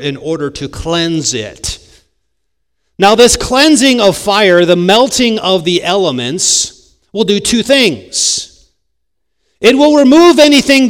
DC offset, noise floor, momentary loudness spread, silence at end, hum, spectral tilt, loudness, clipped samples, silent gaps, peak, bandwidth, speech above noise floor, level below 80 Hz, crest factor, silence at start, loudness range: under 0.1%; -72 dBFS; 13 LU; 0 s; none; -3 dB/octave; -9 LUFS; 2%; none; 0 dBFS; over 20 kHz; 62 dB; -38 dBFS; 10 dB; 0 s; 5 LU